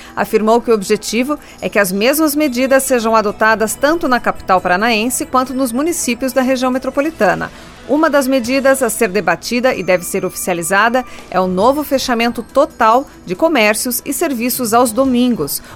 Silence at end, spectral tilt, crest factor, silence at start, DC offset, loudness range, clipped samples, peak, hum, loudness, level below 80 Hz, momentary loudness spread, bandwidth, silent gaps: 0 s; -3.5 dB/octave; 14 dB; 0 s; under 0.1%; 2 LU; under 0.1%; 0 dBFS; none; -14 LUFS; -42 dBFS; 5 LU; 18 kHz; none